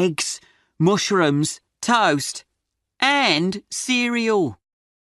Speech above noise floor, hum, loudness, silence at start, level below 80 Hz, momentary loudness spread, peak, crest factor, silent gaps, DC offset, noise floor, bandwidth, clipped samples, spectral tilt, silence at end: 58 dB; none; -20 LUFS; 0 s; -64 dBFS; 10 LU; -4 dBFS; 18 dB; none; under 0.1%; -78 dBFS; 12 kHz; under 0.1%; -4 dB/octave; 0.45 s